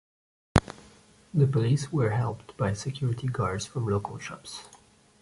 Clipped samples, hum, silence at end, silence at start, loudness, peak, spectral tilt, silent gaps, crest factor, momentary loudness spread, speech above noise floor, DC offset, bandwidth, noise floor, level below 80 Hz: under 0.1%; none; 0.45 s; 0.55 s; -28 LUFS; -2 dBFS; -6.5 dB/octave; none; 28 dB; 15 LU; 28 dB; under 0.1%; 11.5 kHz; -56 dBFS; -46 dBFS